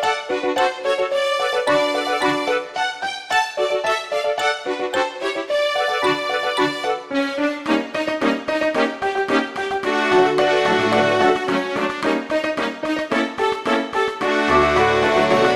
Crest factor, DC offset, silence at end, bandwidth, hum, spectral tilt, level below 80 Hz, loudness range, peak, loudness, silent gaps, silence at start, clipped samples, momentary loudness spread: 16 dB; under 0.1%; 0 s; 13 kHz; none; -4 dB/octave; -50 dBFS; 3 LU; -4 dBFS; -19 LUFS; none; 0 s; under 0.1%; 7 LU